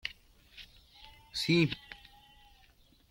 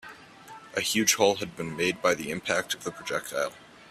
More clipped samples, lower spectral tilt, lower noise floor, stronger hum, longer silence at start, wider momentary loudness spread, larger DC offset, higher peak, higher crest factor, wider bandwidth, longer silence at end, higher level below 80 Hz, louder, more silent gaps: neither; first, -5.5 dB/octave vs -2.5 dB/octave; first, -64 dBFS vs -48 dBFS; neither; about the same, 0.05 s vs 0.05 s; first, 27 LU vs 12 LU; neither; second, -14 dBFS vs -8 dBFS; about the same, 22 dB vs 22 dB; about the same, 16.5 kHz vs 15.5 kHz; first, 1.15 s vs 0.05 s; about the same, -62 dBFS vs -64 dBFS; second, -31 LUFS vs -27 LUFS; neither